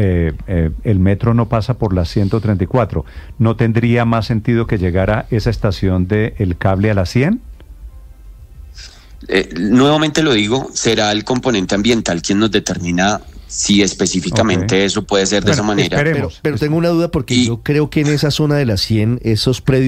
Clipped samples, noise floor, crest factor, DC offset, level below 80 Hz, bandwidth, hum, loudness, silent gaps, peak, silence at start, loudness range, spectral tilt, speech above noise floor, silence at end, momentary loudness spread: under 0.1%; -37 dBFS; 14 dB; under 0.1%; -32 dBFS; 14.5 kHz; none; -15 LUFS; none; 0 dBFS; 0 s; 3 LU; -5.5 dB/octave; 22 dB; 0 s; 5 LU